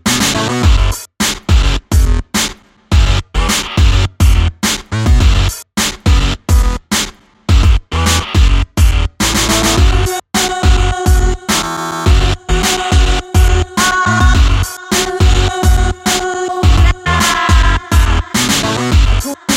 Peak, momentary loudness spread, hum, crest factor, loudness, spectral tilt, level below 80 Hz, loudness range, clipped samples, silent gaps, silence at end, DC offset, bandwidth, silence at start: 0 dBFS; 5 LU; none; 12 dB; -13 LUFS; -4 dB/octave; -14 dBFS; 2 LU; under 0.1%; none; 0 s; under 0.1%; 16.5 kHz; 0.05 s